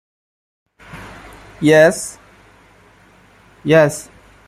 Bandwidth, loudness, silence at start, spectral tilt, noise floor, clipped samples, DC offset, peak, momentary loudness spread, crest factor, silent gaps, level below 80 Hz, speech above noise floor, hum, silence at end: 14.5 kHz; -14 LUFS; 0.95 s; -5 dB/octave; -49 dBFS; under 0.1%; under 0.1%; 0 dBFS; 25 LU; 18 dB; none; -52 dBFS; 36 dB; none; 0.45 s